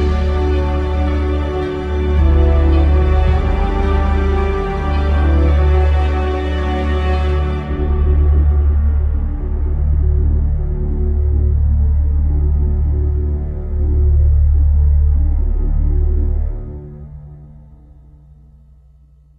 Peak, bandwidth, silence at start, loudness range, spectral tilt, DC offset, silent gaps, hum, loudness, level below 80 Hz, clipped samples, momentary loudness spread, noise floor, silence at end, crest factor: -2 dBFS; 4.7 kHz; 0 s; 4 LU; -9 dB/octave; under 0.1%; none; none; -16 LUFS; -14 dBFS; under 0.1%; 7 LU; -46 dBFS; 1.75 s; 12 dB